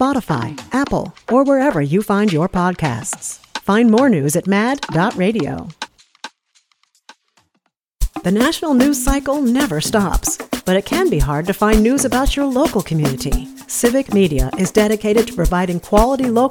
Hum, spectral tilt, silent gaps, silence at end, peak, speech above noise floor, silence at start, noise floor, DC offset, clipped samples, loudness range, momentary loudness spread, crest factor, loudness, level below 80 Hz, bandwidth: none; -5 dB/octave; none; 0 s; 0 dBFS; 52 dB; 0 s; -68 dBFS; under 0.1%; under 0.1%; 5 LU; 10 LU; 16 dB; -17 LUFS; -28 dBFS; 19.5 kHz